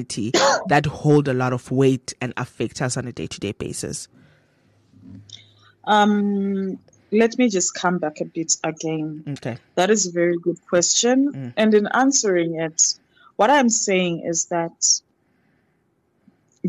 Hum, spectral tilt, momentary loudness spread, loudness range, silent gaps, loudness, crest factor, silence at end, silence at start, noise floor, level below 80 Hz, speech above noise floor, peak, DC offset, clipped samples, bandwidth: none; -3.5 dB/octave; 12 LU; 7 LU; none; -20 LUFS; 18 dB; 0 s; 0 s; -66 dBFS; -58 dBFS; 46 dB; -4 dBFS; under 0.1%; under 0.1%; 13 kHz